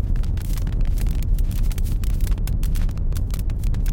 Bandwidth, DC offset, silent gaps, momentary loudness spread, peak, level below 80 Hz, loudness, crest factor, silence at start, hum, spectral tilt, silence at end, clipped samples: 17 kHz; under 0.1%; none; 2 LU; -8 dBFS; -20 dBFS; -25 LUFS; 12 dB; 0 s; none; -6.5 dB/octave; 0 s; under 0.1%